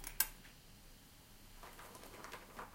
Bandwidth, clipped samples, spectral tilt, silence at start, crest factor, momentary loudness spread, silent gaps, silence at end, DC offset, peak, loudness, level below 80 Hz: 17 kHz; under 0.1%; -1 dB/octave; 0 s; 36 dB; 22 LU; none; 0 s; under 0.1%; -12 dBFS; -44 LUFS; -60 dBFS